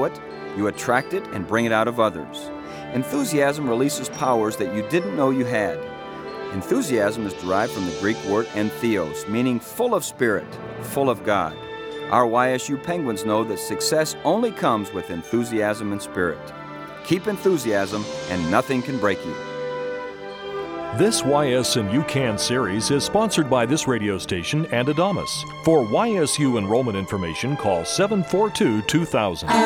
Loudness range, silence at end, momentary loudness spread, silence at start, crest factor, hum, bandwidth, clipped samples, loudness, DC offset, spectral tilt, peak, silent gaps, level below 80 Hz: 3 LU; 0 s; 11 LU; 0 s; 20 dB; none; over 20 kHz; under 0.1%; -22 LUFS; under 0.1%; -4.5 dB/octave; -2 dBFS; none; -54 dBFS